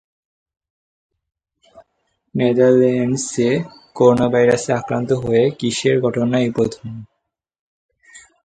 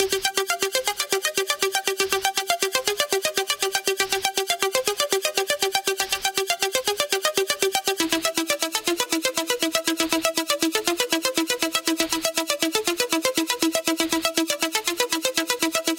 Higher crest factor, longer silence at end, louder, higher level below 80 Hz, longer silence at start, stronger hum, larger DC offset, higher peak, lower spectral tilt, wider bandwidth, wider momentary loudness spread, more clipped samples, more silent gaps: about the same, 18 dB vs 22 dB; first, 0.25 s vs 0 s; first, -17 LUFS vs -22 LUFS; first, -54 dBFS vs -60 dBFS; first, 1.75 s vs 0 s; neither; neither; about the same, 0 dBFS vs -2 dBFS; first, -6 dB/octave vs -0.5 dB/octave; second, 9.4 kHz vs 17 kHz; first, 10 LU vs 1 LU; neither; first, 7.59-7.89 s vs none